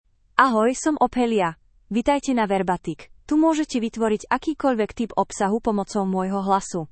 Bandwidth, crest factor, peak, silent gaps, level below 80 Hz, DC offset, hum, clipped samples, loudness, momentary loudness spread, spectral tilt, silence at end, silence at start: 8.8 kHz; 22 dB; 0 dBFS; none; -50 dBFS; under 0.1%; none; under 0.1%; -22 LUFS; 6 LU; -5 dB/octave; 0.05 s; 0.4 s